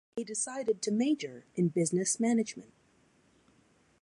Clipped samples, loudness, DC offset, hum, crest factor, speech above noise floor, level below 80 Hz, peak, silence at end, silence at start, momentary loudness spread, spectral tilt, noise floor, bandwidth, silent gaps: under 0.1%; -31 LUFS; under 0.1%; none; 18 dB; 36 dB; -78 dBFS; -16 dBFS; 1.4 s; 0.15 s; 9 LU; -5 dB/octave; -67 dBFS; 11.5 kHz; none